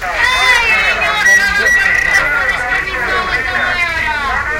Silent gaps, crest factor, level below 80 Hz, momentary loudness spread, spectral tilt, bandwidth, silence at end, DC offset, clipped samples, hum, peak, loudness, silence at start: none; 12 dB; -32 dBFS; 6 LU; -1.5 dB/octave; 17 kHz; 0 s; under 0.1%; under 0.1%; none; 0 dBFS; -11 LUFS; 0 s